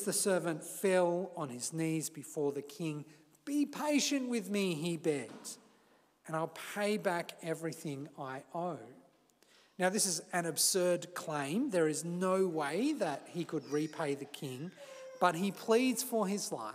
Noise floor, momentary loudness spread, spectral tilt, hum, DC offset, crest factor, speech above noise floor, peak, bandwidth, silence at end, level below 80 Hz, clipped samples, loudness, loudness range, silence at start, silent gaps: -68 dBFS; 13 LU; -4 dB/octave; none; under 0.1%; 22 dB; 33 dB; -12 dBFS; 16 kHz; 0 s; under -90 dBFS; under 0.1%; -35 LUFS; 6 LU; 0 s; none